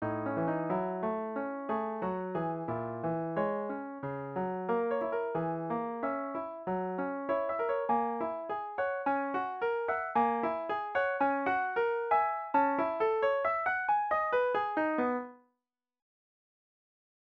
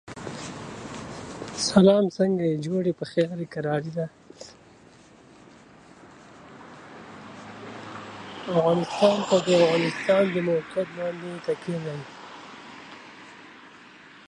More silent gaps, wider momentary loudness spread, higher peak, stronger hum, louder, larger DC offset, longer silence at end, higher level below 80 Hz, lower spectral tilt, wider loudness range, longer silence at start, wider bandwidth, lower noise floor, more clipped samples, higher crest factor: neither; second, 7 LU vs 25 LU; second, -16 dBFS vs -4 dBFS; neither; second, -32 LUFS vs -24 LUFS; neither; first, 1.85 s vs 0.1 s; second, -72 dBFS vs -62 dBFS; first, -9 dB/octave vs -5.5 dB/octave; second, 5 LU vs 20 LU; about the same, 0 s vs 0.05 s; second, 5.8 kHz vs 11 kHz; first, -88 dBFS vs -52 dBFS; neither; second, 16 dB vs 22 dB